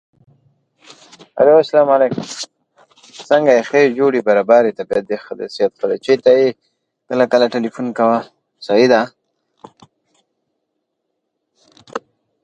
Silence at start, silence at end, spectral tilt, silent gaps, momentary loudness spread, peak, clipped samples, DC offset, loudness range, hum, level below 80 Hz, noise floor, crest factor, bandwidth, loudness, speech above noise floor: 1.35 s; 0.45 s; -5 dB/octave; none; 18 LU; 0 dBFS; under 0.1%; under 0.1%; 5 LU; none; -64 dBFS; -74 dBFS; 16 dB; 9.2 kHz; -15 LUFS; 60 dB